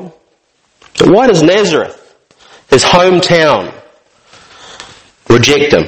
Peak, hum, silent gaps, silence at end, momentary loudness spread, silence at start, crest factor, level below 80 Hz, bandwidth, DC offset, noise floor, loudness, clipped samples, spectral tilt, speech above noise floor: 0 dBFS; none; none; 0 s; 16 LU; 0 s; 12 dB; -40 dBFS; 12 kHz; under 0.1%; -56 dBFS; -8 LUFS; 0.8%; -4.5 dB/octave; 49 dB